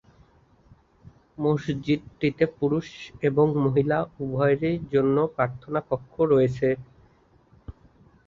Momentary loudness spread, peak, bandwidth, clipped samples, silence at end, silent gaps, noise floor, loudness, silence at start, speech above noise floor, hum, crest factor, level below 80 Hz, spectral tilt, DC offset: 8 LU; -8 dBFS; 7.2 kHz; under 0.1%; 0.55 s; none; -59 dBFS; -25 LUFS; 1.4 s; 35 dB; none; 18 dB; -54 dBFS; -8.5 dB/octave; under 0.1%